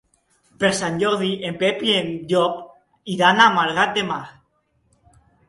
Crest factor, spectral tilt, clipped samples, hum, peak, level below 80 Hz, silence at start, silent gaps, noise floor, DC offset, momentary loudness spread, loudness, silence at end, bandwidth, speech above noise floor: 22 dB; -4 dB/octave; under 0.1%; none; 0 dBFS; -60 dBFS; 0.6 s; none; -66 dBFS; under 0.1%; 14 LU; -19 LUFS; 1.2 s; 11.5 kHz; 46 dB